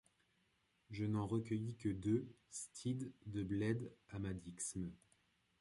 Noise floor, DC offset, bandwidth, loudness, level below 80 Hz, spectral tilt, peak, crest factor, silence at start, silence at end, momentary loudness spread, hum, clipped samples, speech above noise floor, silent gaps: -80 dBFS; under 0.1%; 11.5 kHz; -44 LUFS; -66 dBFS; -6 dB/octave; -26 dBFS; 18 dB; 0.9 s; 0.65 s; 10 LU; none; under 0.1%; 37 dB; none